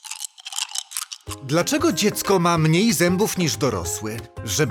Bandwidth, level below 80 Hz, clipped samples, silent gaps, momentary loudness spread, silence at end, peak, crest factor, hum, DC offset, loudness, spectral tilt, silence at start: 19 kHz; -50 dBFS; under 0.1%; none; 14 LU; 0 s; -4 dBFS; 18 dB; none; under 0.1%; -21 LUFS; -4 dB/octave; 0.05 s